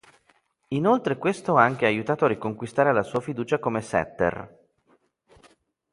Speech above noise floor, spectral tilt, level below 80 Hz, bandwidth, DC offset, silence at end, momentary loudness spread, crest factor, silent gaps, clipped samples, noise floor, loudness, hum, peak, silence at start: 42 dB; -6.5 dB/octave; -58 dBFS; 11.5 kHz; under 0.1%; 1.45 s; 9 LU; 22 dB; none; under 0.1%; -65 dBFS; -24 LUFS; none; -2 dBFS; 0.7 s